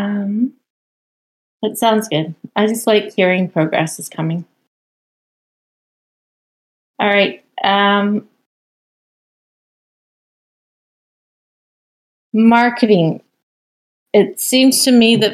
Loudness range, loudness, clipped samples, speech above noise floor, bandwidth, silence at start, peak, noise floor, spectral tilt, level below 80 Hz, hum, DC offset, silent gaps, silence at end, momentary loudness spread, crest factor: 8 LU; -15 LUFS; under 0.1%; over 76 dB; 15.5 kHz; 0 s; 0 dBFS; under -90 dBFS; -4.5 dB/octave; -66 dBFS; none; under 0.1%; 0.70-1.60 s, 4.67-6.94 s, 8.46-12.32 s, 13.43-14.06 s; 0 s; 12 LU; 16 dB